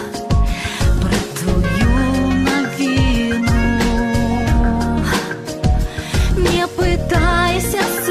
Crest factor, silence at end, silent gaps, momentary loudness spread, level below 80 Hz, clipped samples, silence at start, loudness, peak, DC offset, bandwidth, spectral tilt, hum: 12 dB; 0 s; none; 4 LU; -22 dBFS; under 0.1%; 0 s; -17 LUFS; -4 dBFS; under 0.1%; 14.5 kHz; -5.5 dB/octave; none